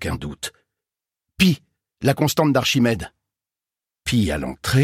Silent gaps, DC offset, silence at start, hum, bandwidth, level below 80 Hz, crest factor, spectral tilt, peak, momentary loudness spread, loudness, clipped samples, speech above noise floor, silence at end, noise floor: none; under 0.1%; 0 s; none; 16.5 kHz; -42 dBFS; 18 dB; -5 dB/octave; -4 dBFS; 13 LU; -21 LUFS; under 0.1%; 70 dB; 0 s; -89 dBFS